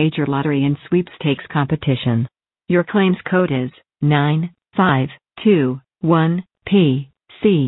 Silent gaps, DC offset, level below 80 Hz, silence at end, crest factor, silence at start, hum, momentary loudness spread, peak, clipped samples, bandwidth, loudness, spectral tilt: none; under 0.1%; -54 dBFS; 0 s; 14 dB; 0 s; none; 8 LU; -2 dBFS; under 0.1%; 4.1 kHz; -18 LUFS; -12.5 dB/octave